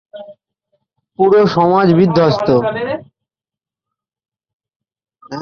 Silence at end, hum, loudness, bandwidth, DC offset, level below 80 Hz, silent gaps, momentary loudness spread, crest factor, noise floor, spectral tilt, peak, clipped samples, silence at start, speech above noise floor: 0 s; none; -13 LUFS; 6.8 kHz; under 0.1%; -52 dBFS; 4.53-4.60 s, 4.76-4.80 s; 12 LU; 16 dB; -89 dBFS; -8 dB/octave; -2 dBFS; under 0.1%; 0.15 s; 77 dB